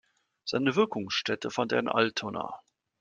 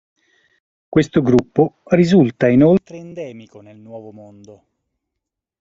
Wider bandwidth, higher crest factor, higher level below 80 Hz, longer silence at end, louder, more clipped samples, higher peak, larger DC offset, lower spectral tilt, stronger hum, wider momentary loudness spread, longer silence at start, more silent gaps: first, 9.2 kHz vs 7.8 kHz; first, 22 dB vs 16 dB; second, -72 dBFS vs -50 dBFS; second, 0.45 s vs 1.5 s; second, -29 LUFS vs -15 LUFS; neither; second, -8 dBFS vs -2 dBFS; neither; second, -4.5 dB/octave vs -8 dB/octave; neither; second, 13 LU vs 23 LU; second, 0.45 s vs 0.9 s; neither